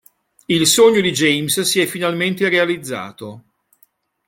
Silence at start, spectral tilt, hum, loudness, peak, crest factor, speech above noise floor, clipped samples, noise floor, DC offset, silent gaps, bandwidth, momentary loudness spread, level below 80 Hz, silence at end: 0.5 s; -3 dB/octave; none; -15 LUFS; -2 dBFS; 16 dB; 42 dB; under 0.1%; -58 dBFS; under 0.1%; none; 17 kHz; 16 LU; -58 dBFS; 0.9 s